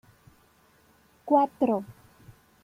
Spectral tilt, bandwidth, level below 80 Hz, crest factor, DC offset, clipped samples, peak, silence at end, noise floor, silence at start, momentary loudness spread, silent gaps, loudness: -8 dB/octave; 15.5 kHz; -68 dBFS; 20 dB; under 0.1%; under 0.1%; -10 dBFS; 0.7 s; -62 dBFS; 1.25 s; 24 LU; none; -26 LUFS